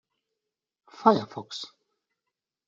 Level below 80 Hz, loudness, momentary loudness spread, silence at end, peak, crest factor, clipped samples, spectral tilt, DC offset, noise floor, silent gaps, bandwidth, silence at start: -78 dBFS; -25 LUFS; 16 LU; 1 s; -6 dBFS; 26 dB; under 0.1%; -6 dB/octave; under 0.1%; -87 dBFS; none; 7.8 kHz; 1 s